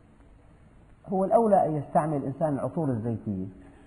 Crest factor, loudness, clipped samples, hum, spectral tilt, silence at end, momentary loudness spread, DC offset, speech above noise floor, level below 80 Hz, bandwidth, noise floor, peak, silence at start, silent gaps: 18 dB; -27 LUFS; under 0.1%; none; -10 dB/octave; 0.15 s; 11 LU; under 0.1%; 28 dB; -56 dBFS; 10.5 kHz; -54 dBFS; -10 dBFS; 1.05 s; none